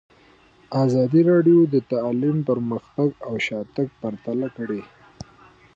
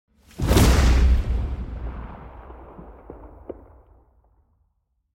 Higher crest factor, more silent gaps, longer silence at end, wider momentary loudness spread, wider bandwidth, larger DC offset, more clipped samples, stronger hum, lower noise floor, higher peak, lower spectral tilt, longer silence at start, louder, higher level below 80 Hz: second, 14 dB vs 20 dB; neither; second, 0.9 s vs 1.65 s; second, 12 LU vs 26 LU; second, 7.6 kHz vs 16.5 kHz; neither; neither; neither; second, -54 dBFS vs -71 dBFS; second, -8 dBFS vs -4 dBFS; first, -8.5 dB/octave vs -5.5 dB/octave; first, 0.7 s vs 0.4 s; about the same, -21 LUFS vs -21 LUFS; second, -60 dBFS vs -24 dBFS